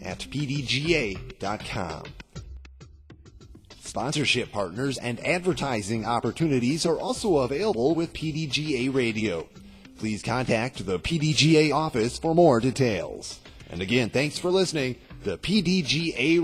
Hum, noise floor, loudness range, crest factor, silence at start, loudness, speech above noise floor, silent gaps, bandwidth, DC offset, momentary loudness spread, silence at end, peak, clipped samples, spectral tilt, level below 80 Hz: none; -49 dBFS; 7 LU; 18 dB; 0 s; -25 LUFS; 24 dB; none; 15 kHz; under 0.1%; 14 LU; 0 s; -8 dBFS; under 0.1%; -5 dB/octave; -48 dBFS